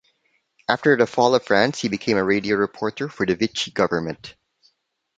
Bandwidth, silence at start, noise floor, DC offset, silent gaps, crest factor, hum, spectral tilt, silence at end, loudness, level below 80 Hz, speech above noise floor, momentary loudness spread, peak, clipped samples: 9.2 kHz; 0.7 s; -68 dBFS; under 0.1%; none; 20 dB; none; -5 dB/octave; 0.85 s; -21 LUFS; -56 dBFS; 47 dB; 10 LU; -2 dBFS; under 0.1%